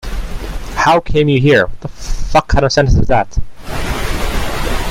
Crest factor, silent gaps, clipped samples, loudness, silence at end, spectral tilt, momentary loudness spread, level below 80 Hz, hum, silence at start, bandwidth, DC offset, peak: 14 dB; none; under 0.1%; -14 LUFS; 0 s; -5.5 dB/octave; 15 LU; -20 dBFS; none; 0.05 s; 16.5 kHz; under 0.1%; 0 dBFS